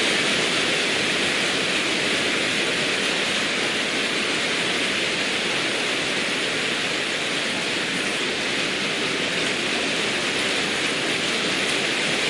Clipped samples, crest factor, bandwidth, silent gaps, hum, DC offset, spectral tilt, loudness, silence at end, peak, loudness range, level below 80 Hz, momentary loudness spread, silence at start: under 0.1%; 14 dB; 11.5 kHz; none; none; under 0.1%; -2 dB/octave; -21 LUFS; 0 s; -8 dBFS; 2 LU; -60 dBFS; 3 LU; 0 s